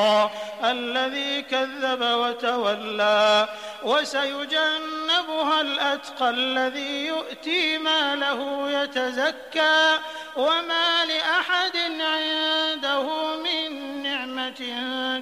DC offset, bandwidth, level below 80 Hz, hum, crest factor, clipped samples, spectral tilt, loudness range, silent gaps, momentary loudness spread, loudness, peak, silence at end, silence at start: under 0.1%; 15.5 kHz; -72 dBFS; none; 16 dB; under 0.1%; -2 dB/octave; 2 LU; none; 7 LU; -23 LUFS; -8 dBFS; 0 s; 0 s